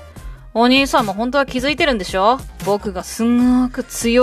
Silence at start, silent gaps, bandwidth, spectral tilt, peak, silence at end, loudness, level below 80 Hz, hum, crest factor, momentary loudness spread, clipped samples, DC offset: 0 s; none; 14.5 kHz; -4 dB/octave; 0 dBFS; 0 s; -17 LUFS; -36 dBFS; none; 16 dB; 8 LU; under 0.1%; under 0.1%